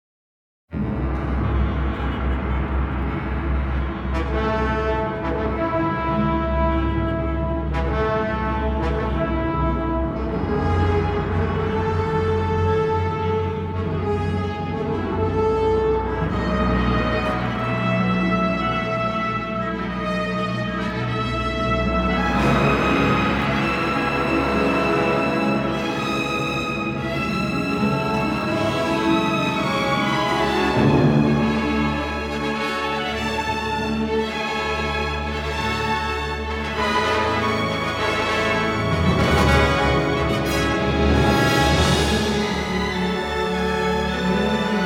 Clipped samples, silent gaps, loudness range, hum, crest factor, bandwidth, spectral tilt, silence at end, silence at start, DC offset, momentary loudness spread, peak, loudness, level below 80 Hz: under 0.1%; none; 4 LU; none; 18 dB; 16.5 kHz; -6 dB/octave; 0 s; 0.7 s; under 0.1%; 7 LU; -2 dBFS; -21 LUFS; -30 dBFS